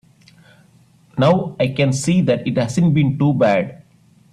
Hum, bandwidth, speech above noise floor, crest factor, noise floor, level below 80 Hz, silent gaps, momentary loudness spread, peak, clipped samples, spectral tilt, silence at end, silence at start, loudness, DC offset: none; 12 kHz; 36 dB; 16 dB; -52 dBFS; -52 dBFS; none; 5 LU; -2 dBFS; under 0.1%; -6.5 dB/octave; 0.55 s; 1.15 s; -17 LUFS; under 0.1%